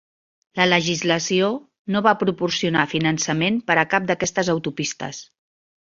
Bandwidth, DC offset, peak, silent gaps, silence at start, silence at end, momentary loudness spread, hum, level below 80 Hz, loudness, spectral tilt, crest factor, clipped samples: 7.8 kHz; under 0.1%; -2 dBFS; 1.79-1.85 s; 0.55 s; 0.6 s; 9 LU; none; -60 dBFS; -20 LUFS; -4 dB/octave; 20 dB; under 0.1%